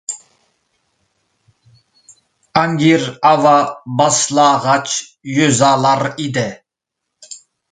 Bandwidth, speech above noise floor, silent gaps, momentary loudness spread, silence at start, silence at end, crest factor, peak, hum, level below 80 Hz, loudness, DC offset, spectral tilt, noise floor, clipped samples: 9.6 kHz; 65 dB; none; 16 LU; 0.1 s; 0.35 s; 16 dB; 0 dBFS; none; -58 dBFS; -14 LUFS; under 0.1%; -4 dB/octave; -79 dBFS; under 0.1%